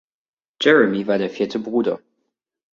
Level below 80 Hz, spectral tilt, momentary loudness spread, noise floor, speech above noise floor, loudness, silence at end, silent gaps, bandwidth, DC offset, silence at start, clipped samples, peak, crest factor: -64 dBFS; -5.5 dB/octave; 10 LU; -75 dBFS; 57 dB; -19 LUFS; 0.75 s; none; 7.4 kHz; under 0.1%; 0.6 s; under 0.1%; -2 dBFS; 20 dB